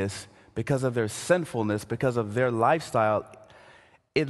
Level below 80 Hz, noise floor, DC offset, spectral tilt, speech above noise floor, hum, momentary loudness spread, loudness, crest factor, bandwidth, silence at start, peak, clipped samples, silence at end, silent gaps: -56 dBFS; -56 dBFS; under 0.1%; -6 dB/octave; 30 dB; none; 11 LU; -27 LUFS; 18 dB; 12.5 kHz; 0 s; -10 dBFS; under 0.1%; 0 s; none